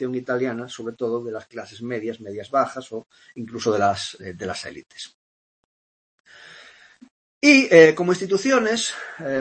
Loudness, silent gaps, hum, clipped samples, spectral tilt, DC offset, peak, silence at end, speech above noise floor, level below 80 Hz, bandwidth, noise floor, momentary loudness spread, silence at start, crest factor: -20 LUFS; 5.14-6.24 s, 7.11-7.41 s; none; under 0.1%; -4 dB/octave; under 0.1%; 0 dBFS; 0 s; 28 dB; -66 dBFS; 8.8 kHz; -49 dBFS; 23 LU; 0 s; 22 dB